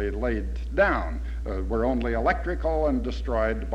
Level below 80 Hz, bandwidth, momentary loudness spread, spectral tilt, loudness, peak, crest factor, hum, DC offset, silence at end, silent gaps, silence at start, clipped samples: -30 dBFS; 7.2 kHz; 8 LU; -8 dB/octave; -26 LUFS; -10 dBFS; 16 dB; none; under 0.1%; 0 s; none; 0 s; under 0.1%